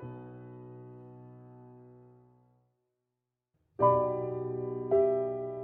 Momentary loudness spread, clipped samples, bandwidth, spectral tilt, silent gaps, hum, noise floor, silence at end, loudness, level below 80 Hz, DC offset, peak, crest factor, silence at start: 25 LU; under 0.1%; 3.2 kHz; -9.5 dB/octave; none; none; -87 dBFS; 0 s; -30 LUFS; -68 dBFS; under 0.1%; -12 dBFS; 22 dB; 0 s